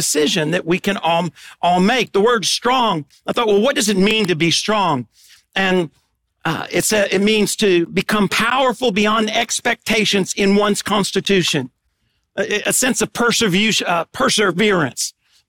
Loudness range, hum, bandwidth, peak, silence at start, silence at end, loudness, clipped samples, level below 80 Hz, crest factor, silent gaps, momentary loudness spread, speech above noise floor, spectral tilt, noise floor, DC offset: 2 LU; none; 18 kHz; -6 dBFS; 0 s; 0.4 s; -16 LUFS; under 0.1%; -50 dBFS; 12 dB; none; 7 LU; 50 dB; -3.5 dB/octave; -67 dBFS; under 0.1%